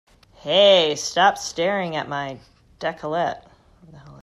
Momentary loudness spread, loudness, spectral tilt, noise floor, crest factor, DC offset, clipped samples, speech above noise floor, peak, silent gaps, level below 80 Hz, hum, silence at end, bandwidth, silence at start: 19 LU; -20 LUFS; -3 dB/octave; -48 dBFS; 18 dB; under 0.1%; under 0.1%; 28 dB; -4 dBFS; none; -58 dBFS; none; 0.1 s; 13 kHz; 0.45 s